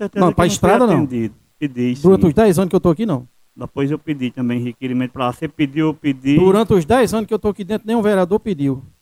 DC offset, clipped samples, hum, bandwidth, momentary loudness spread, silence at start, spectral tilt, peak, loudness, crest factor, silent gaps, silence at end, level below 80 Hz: under 0.1%; under 0.1%; none; 16 kHz; 10 LU; 0 s; -6.5 dB/octave; 0 dBFS; -17 LUFS; 16 dB; none; 0.15 s; -42 dBFS